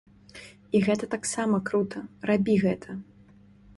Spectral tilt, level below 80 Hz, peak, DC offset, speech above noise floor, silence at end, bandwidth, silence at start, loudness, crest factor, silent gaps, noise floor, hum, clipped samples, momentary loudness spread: -5.5 dB/octave; -60 dBFS; -10 dBFS; under 0.1%; 29 dB; 0.75 s; 11.5 kHz; 0.35 s; -27 LUFS; 18 dB; none; -54 dBFS; none; under 0.1%; 19 LU